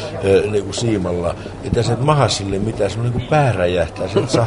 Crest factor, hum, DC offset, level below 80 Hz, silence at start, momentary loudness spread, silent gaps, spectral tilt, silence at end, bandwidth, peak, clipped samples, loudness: 16 dB; none; under 0.1%; -38 dBFS; 0 s; 6 LU; none; -6 dB/octave; 0 s; 11 kHz; 0 dBFS; under 0.1%; -18 LUFS